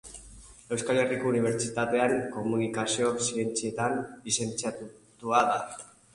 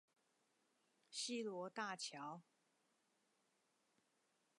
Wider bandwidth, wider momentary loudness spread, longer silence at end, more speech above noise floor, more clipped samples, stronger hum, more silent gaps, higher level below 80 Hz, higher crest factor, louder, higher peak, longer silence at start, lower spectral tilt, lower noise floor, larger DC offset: about the same, 11.5 kHz vs 11 kHz; first, 15 LU vs 9 LU; second, 0.3 s vs 2.15 s; second, 22 dB vs 35 dB; neither; neither; neither; first, -60 dBFS vs under -90 dBFS; about the same, 20 dB vs 22 dB; first, -28 LUFS vs -48 LUFS; first, -10 dBFS vs -32 dBFS; second, 0.05 s vs 1.1 s; first, -4 dB/octave vs -2.5 dB/octave; second, -50 dBFS vs -84 dBFS; neither